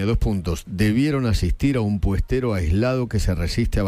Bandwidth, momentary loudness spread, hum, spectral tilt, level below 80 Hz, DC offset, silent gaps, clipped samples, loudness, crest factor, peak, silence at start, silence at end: 16 kHz; 3 LU; none; -7 dB/octave; -28 dBFS; under 0.1%; none; under 0.1%; -22 LUFS; 12 dB; -8 dBFS; 0 s; 0 s